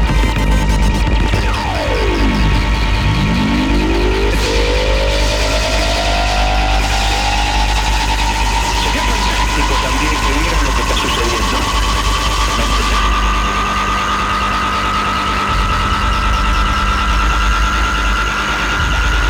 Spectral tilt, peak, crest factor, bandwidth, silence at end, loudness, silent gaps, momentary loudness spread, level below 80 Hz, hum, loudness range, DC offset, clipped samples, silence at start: -4 dB/octave; -2 dBFS; 12 dB; 16 kHz; 0 s; -15 LUFS; none; 1 LU; -16 dBFS; 50 Hz at -20 dBFS; 0 LU; under 0.1%; under 0.1%; 0 s